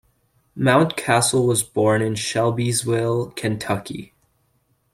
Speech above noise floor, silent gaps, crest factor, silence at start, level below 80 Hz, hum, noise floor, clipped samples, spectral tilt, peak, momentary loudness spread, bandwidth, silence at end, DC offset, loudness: 46 dB; none; 18 dB; 0.55 s; -56 dBFS; none; -66 dBFS; under 0.1%; -4.5 dB/octave; -2 dBFS; 9 LU; 16 kHz; 0.9 s; under 0.1%; -20 LUFS